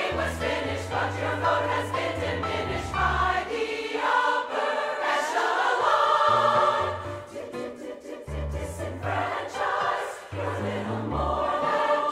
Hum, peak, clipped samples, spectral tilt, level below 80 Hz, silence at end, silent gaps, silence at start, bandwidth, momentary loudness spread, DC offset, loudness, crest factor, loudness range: none; -8 dBFS; under 0.1%; -4.5 dB/octave; -44 dBFS; 0 s; none; 0 s; 15.5 kHz; 13 LU; under 0.1%; -26 LUFS; 18 dB; 7 LU